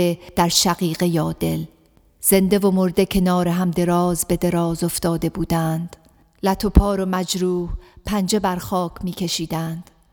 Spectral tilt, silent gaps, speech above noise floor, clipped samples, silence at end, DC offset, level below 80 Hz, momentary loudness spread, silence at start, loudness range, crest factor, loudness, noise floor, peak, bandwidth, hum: -5 dB/octave; none; 34 dB; under 0.1%; 0.3 s; under 0.1%; -32 dBFS; 10 LU; 0 s; 3 LU; 20 dB; -20 LUFS; -53 dBFS; 0 dBFS; over 20 kHz; none